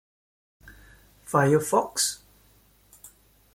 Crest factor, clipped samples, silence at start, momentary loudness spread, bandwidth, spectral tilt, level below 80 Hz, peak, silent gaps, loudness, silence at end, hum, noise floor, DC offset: 22 dB; under 0.1%; 0.65 s; 6 LU; 16.5 kHz; -4 dB/octave; -60 dBFS; -6 dBFS; none; -24 LUFS; 0.45 s; none; -60 dBFS; under 0.1%